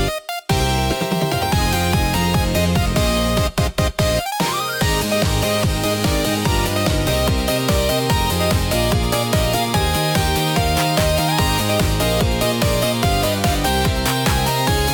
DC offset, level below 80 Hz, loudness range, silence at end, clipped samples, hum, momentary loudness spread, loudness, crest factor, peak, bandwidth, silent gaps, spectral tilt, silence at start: under 0.1%; -26 dBFS; 1 LU; 0 s; under 0.1%; none; 2 LU; -18 LUFS; 14 dB; -4 dBFS; 19 kHz; none; -4.5 dB/octave; 0 s